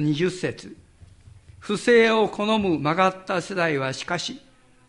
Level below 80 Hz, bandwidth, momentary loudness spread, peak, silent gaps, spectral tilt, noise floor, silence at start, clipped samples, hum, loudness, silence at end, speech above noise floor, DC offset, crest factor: -56 dBFS; 11.5 kHz; 14 LU; -6 dBFS; none; -5 dB/octave; -49 dBFS; 0 s; under 0.1%; none; -22 LUFS; 0.5 s; 27 dB; under 0.1%; 18 dB